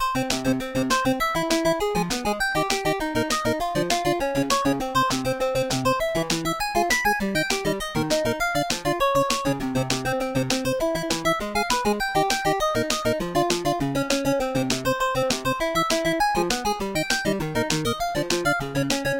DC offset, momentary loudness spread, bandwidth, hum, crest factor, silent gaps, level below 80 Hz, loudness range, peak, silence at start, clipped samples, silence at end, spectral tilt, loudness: 0.2%; 3 LU; 17 kHz; none; 20 dB; none; -42 dBFS; 1 LU; -4 dBFS; 0 s; under 0.1%; 0 s; -3.5 dB/octave; -23 LUFS